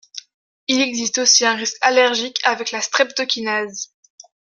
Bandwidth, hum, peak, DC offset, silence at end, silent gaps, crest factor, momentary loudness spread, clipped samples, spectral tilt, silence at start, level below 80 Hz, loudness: 11 kHz; none; 0 dBFS; under 0.1%; 0.7 s; 0.34-0.67 s; 18 dB; 17 LU; under 0.1%; 0 dB/octave; 0.15 s; -70 dBFS; -17 LUFS